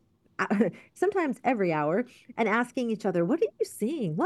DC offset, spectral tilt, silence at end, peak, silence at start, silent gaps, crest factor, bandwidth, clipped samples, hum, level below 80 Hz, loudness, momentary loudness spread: under 0.1%; -6.5 dB/octave; 0 s; -12 dBFS; 0.4 s; none; 16 dB; 12.5 kHz; under 0.1%; none; -76 dBFS; -28 LUFS; 5 LU